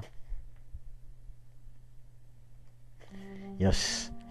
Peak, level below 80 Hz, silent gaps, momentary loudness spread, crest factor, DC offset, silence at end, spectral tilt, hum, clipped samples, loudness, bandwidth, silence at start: -14 dBFS; -44 dBFS; none; 28 LU; 22 dB; 0.3%; 0 s; -4 dB/octave; none; under 0.1%; -32 LUFS; 13 kHz; 0 s